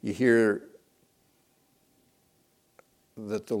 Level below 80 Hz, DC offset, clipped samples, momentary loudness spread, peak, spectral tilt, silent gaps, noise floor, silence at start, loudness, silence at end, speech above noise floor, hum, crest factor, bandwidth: -72 dBFS; under 0.1%; under 0.1%; 14 LU; -10 dBFS; -6.5 dB/octave; none; -68 dBFS; 0.05 s; -26 LUFS; 0 s; 43 dB; none; 22 dB; 14.5 kHz